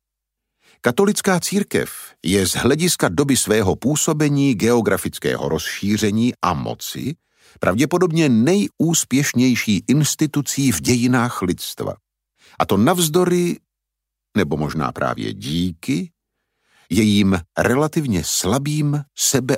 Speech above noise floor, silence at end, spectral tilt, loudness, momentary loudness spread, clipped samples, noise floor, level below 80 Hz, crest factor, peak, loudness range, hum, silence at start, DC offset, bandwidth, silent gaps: 64 dB; 0 s; -4.5 dB/octave; -19 LUFS; 8 LU; under 0.1%; -82 dBFS; -48 dBFS; 18 dB; -2 dBFS; 4 LU; none; 0.85 s; under 0.1%; 16.5 kHz; none